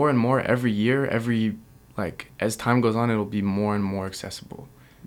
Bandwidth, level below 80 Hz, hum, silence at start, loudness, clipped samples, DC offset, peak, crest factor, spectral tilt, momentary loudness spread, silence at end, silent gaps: 17 kHz; -56 dBFS; none; 0 s; -24 LUFS; under 0.1%; under 0.1%; -6 dBFS; 18 dB; -6.5 dB/octave; 15 LU; 0 s; none